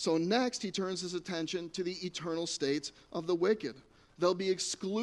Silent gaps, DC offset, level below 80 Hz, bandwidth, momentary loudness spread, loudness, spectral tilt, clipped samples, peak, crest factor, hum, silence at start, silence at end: none; under 0.1%; -70 dBFS; 11.5 kHz; 7 LU; -34 LUFS; -4 dB/octave; under 0.1%; -16 dBFS; 18 dB; none; 0 s; 0 s